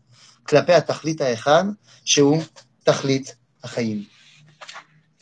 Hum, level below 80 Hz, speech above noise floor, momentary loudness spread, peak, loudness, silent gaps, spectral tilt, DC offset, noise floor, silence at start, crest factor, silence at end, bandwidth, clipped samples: none; -68 dBFS; 27 dB; 23 LU; -2 dBFS; -20 LUFS; none; -4 dB/octave; under 0.1%; -47 dBFS; 0.5 s; 20 dB; 0.4 s; 9.4 kHz; under 0.1%